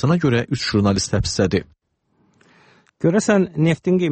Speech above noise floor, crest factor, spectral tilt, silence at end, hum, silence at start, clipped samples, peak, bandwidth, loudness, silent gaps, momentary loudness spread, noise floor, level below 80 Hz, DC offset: 47 dB; 16 dB; -5.5 dB/octave; 0 s; none; 0 s; under 0.1%; -4 dBFS; 8.8 kHz; -19 LUFS; none; 4 LU; -64 dBFS; -40 dBFS; under 0.1%